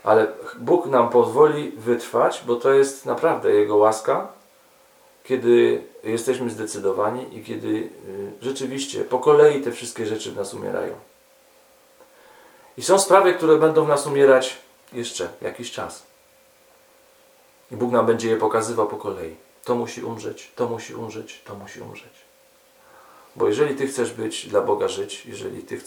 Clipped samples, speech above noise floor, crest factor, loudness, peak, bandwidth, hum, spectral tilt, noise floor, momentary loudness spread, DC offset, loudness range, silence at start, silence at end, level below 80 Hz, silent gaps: under 0.1%; 35 dB; 22 dB; -21 LUFS; 0 dBFS; 18.5 kHz; none; -4.5 dB/octave; -55 dBFS; 18 LU; under 0.1%; 12 LU; 0.05 s; 0.05 s; -70 dBFS; none